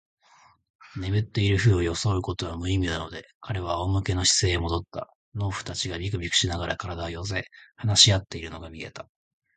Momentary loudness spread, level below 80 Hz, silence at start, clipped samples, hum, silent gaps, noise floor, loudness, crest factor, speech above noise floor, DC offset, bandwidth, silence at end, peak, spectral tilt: 18 LU; -40 dBFS; 0.85 s; under 0.1%; none; 3.35-3.41 s, 5.15-5.32 s; -58 dBFS; -25 LUFS; 22 dB; 32 dB; under 0.1%; 9.4 kHz; 0.55 s; -4 dBFS; -3.5 dB/octave